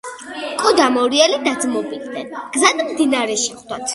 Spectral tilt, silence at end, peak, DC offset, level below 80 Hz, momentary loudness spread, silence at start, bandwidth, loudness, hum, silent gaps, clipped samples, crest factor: -1.5 dB/octave; 0 s; 0 dBFS; under 0.1%; -60 dBFS; 14 LU; 0.05 s; 12 kHz; -17 LUFS; none; none; under 0.1%; 18 dB